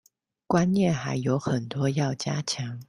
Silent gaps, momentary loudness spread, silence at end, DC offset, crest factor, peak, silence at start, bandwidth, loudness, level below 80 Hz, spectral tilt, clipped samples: none; 6 LU; 0.05 s; under 0.1%; 18 dB; -8 dBFS; 0.5 s; 11.5 kHz; -26 LUFS; -60 dBFS; -6 dB/octave; under 0.1%